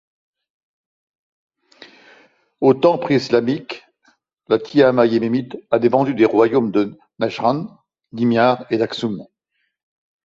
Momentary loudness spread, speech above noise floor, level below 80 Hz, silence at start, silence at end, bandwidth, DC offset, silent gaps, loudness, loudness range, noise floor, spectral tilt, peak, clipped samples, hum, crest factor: 12 LU; 55 dB; -62 dBFS; 1.8 s; 1 s; 7.6 kHz; under 0.1%; none; -18 LUFS; 4 LU; -72 dBFS; -7 dB/octave; -2 dBFS; under 0.1%; none; 18 dB